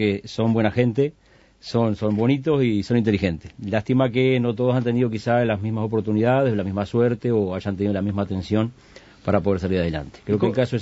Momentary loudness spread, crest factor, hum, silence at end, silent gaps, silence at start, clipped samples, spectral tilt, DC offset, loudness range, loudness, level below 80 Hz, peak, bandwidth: 6 LU; 18 dB; none; 0 s; none; 0 s; under 0.1%; -8 dB/octave; under 0.1%; 3 LU; -22 LUFS; -50 dBFS; -2 dBFS; 8 kHz